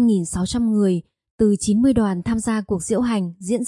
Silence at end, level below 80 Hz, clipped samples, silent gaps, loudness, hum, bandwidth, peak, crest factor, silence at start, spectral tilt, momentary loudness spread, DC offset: 0 s; -44 dBFS; under 0.1%; 1.30-1.38 s; -20 LUFS; none; 11.5 kHz; -6 dBFS; 14 dB; 0 s; -6 dB/octave; 6 LU; under 0.1%